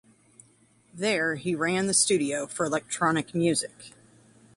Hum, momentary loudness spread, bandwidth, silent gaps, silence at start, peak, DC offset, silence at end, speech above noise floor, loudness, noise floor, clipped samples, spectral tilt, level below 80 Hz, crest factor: none; 8 LU; 11.5 kHz; none; 0.95 s; -8 dBFS; under 0.1%; 0.7 s; 35 dB; -26 LUFS; -62 dBFS; under 0.1%; -3.5 dB/octave; -68 dBFS; 20 dB